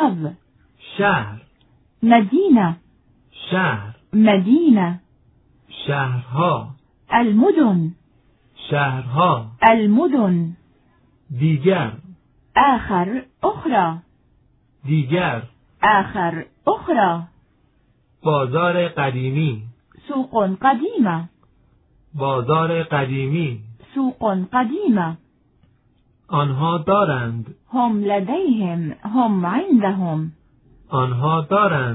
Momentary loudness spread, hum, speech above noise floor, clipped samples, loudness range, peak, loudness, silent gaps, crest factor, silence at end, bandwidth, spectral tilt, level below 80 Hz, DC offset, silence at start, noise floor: 13 LU; none; 42 dB; under 0.1%; 4 LU; 0 dBFS; -19 LUFS; none; 20 dB; 0 s; 4.1 kHz; -11 dB/octave; -54 dBFS; under 0.1%; 0 s; -59 dBFS